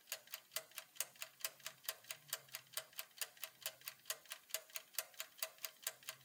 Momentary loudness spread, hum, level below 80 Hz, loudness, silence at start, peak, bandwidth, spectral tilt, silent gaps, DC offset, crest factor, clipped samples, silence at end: 3 LU; none; under -90 dBFS; -47 LUFS; 0 s; -22 dBFS; 18 kHz; 2 dB/octave; none; under 0.1%; 30 dB; under 0.1%; 0 s